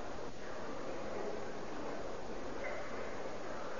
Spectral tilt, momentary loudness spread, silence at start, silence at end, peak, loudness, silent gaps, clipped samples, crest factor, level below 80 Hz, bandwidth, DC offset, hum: -3.5 dB/octave; 3 LU; 0 s; 0 s; -28 dBFS; -44 LUFS; none; under 0.1%; 14 dB; -58 dBFS; 7.2 kHz; 0.9%; none